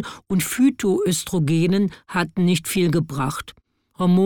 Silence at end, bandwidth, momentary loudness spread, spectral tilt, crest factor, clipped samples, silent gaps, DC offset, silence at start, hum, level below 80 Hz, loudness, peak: 0 s; 19 kHz; 7 LU; -5.5 dB/octave; 12 dB; under 0.1%; none; under 0.1%; 0 s; none; -50 dBFS; -21 LUFS; -8 dBFS